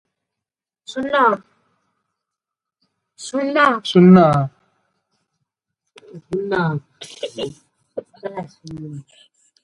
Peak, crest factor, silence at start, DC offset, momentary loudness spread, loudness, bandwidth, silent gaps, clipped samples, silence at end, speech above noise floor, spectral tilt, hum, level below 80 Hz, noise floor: 0 dBFS; 20 dB; 0.9 s; under 0.1%; 23 LU; -17 LUFS; 11 kHz; none; under 0.1%; 0.6 s; 69 dB; -7 dB/octave; none; -58 dBFS; -86 dBFS